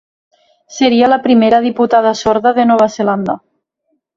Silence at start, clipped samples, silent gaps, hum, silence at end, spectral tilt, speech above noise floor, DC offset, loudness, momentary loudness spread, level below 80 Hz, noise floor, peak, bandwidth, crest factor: 0.7 s; under 0.1%; none; none; 0.8 s; -5 dB/octave; 55 dB; under 0.1%; -12 LUFS; 9 LU; -52 dBFS; -66 dBFS; 0 dBFS; 7.4 kHz; 12 dB